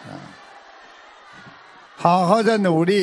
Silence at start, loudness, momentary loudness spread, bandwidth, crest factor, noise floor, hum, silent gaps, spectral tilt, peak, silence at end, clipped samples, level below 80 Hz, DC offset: 0.05 s; -18 LUFS; 22 LU; 11 kHz; 20 dB; -45 dBFS; none; none; -6.5 dB/octave; -2 dBFS; 0 s; under 0.1%; -68 dBFS; under 0.1%